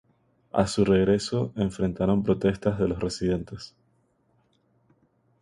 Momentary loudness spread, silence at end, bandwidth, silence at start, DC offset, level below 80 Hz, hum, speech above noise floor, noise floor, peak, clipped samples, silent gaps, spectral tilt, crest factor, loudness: 9 LU; 1.75 s; 11.5 kHz; 0.55 s; under 0.1%; -48 dBFS; none; 43 dB; -68 dBFS; -8 dBFS; under 0.1%; none; -6.5 dB/octave; 20 dB; -25 LUFS